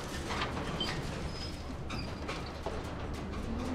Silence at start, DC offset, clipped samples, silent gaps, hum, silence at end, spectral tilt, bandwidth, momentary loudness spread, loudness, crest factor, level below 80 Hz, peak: 0 s; under 0.1%; under 0.1%; none; none; 0 s; -5 dB/octave; 15.5 kHz; 5 LU; -38 LUFS; 16 dB; -44 dBFS; -22 dBFS